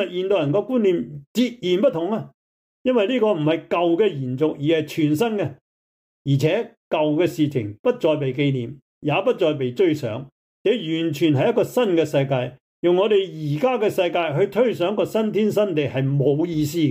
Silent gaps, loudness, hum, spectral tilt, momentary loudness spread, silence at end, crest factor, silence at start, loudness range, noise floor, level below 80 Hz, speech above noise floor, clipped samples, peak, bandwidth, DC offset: 1.27-1.35 s, 2.34-2.85 s, 5.61-6.25 s, 6.77-6.91 s, 7.79-7.84 s, 8.82-9.01 s, 10.32-10.65 s, 12.60-12.83 s; -21 LUFS; none; -7 dB/octave; 7 LU; 0 s; 14 dB; 0 s; 2 LU; under -90 dBFS; -64 dBFS; over 70 dB; under 0.1%; -8 dBFS; 16 kHz; under 0.1%